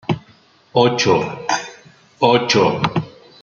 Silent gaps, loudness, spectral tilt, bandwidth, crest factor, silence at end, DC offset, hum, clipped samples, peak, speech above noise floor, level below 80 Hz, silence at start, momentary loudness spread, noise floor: none; -17 LUFS; -4.5 dB/octave; 7.4 kHz; 18 dB; 0.35 s; under 0.1%; none; under 0.1%; -2 dBFS; 36 dB; -56 dBFS; 0.1 s; 12 LU; -51 dBFS